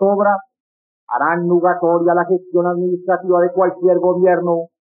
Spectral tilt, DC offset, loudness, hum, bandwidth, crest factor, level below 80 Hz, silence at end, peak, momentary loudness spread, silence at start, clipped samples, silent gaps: -10 dB/octave; under 0.1%; -16 LUFS; none; 2.6 kHz; 12 dB; -68 dBFS; 0.15 s; -4 dBFS; 5 LU; 0 s; under 0.1%; 0.60-1.07 s